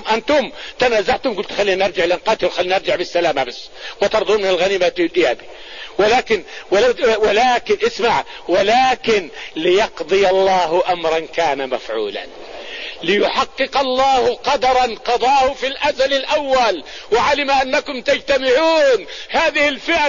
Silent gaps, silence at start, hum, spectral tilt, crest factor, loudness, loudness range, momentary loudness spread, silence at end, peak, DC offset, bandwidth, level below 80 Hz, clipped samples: none; 0 s; none; -3 dB/octave; 14 dB; -16 LUFS; 3 LU; 9 LU; 0 s; -4 dBFS; 0.9%; 7.4 kHz; -46 dBFS; under 0.1%